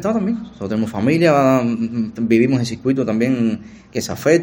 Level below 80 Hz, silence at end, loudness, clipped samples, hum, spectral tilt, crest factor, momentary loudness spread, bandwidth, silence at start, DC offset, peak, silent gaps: -52 dBFS; 0 s; -18 LUFS; under 0.1%; none; -6.5 dB/octave; 18 dB; 11 LU; 17 kHz; 0 s; under 0.1%; 0 dBFS; none